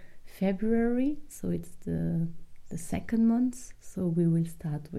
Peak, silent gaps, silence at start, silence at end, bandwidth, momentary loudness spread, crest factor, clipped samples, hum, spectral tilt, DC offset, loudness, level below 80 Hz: -16 dBFS; none; 0 s; 0 s; 14 kHz; 11 LU; 14 dB; under 0.1%; none; -8 dB/octave; under 0.1%; -30 LUFS; -48 dBFS